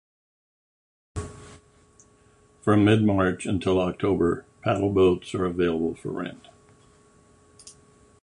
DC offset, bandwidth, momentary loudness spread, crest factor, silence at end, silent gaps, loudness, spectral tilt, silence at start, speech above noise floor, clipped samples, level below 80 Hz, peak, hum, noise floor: under 0.1%; 11 kHz; 17 LU; 20 dB; 0.55 s; none; -24 LUFS; -7 dB/octave; 1.15 s; 35 dB; under 0.1%; -48 dBFS; -6 dBFS; none; -58 dBFS